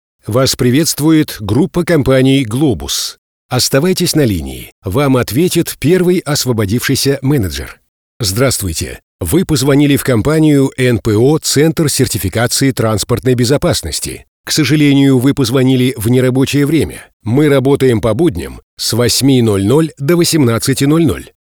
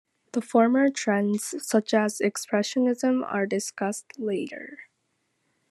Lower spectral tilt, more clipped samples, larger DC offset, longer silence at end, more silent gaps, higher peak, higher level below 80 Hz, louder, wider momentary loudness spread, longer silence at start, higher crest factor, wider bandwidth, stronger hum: about the same, -5 dB/octave vs -4.5 dB/octave; neither; neither; second, 0.2 s vs 0.9 s; first, 3.18-3.49 s, 4.72-4.82 s, 7.89-8.20 s, 9.03-9.19 s, 14.28-14.44 s, 17.13-17.20 s, 18.63-18.77 s vs none; first, 0 dBFS vs -8 dBFS; first, -36 dBFS vs -80 dBFS; first, -12 LUFS vs -25 LUFS; about the same, 9 LU vs 11 LU; about the same, 0.25 s vs 0.35 s; second, 12 dB vs 18 dB; first, over 20 kHz vs 13 kHz; neither